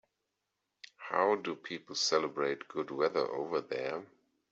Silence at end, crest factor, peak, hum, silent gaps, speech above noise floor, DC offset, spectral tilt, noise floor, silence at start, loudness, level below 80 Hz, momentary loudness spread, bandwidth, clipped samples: 0.45 s; 20 dB; -16 dBFS; none; none; 52 dB; under 0.1%; -1.5 dB/octave; -85 dBFS; 1 s; -34 LUFS; -82 dBFS; 9 LU; 8 kHz; under 0.1%